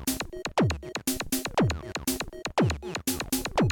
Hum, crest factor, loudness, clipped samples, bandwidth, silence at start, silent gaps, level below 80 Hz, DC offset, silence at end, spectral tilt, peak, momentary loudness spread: none; 14 dB; -29 LUFS; under 0.1%; 17.5 kHz; 0 s; none; -44 dBFS; under 0.1%; 0 s; -4.5 dB/octave; -14 dBFS; 5 LU